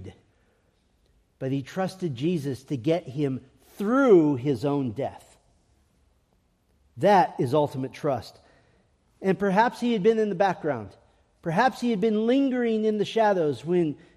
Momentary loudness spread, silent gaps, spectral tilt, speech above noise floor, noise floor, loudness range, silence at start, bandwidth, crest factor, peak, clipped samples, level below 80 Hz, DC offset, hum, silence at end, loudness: 11 LU; none; -7 dB/octave; 43 dB; -67 dBFS; 3 LU; 0 s; 14 kHz; 18 dB; -8 dBFS; under 0.1%; -66 dBFS; under 0.1%; none; 0.2 s; -25 LUFS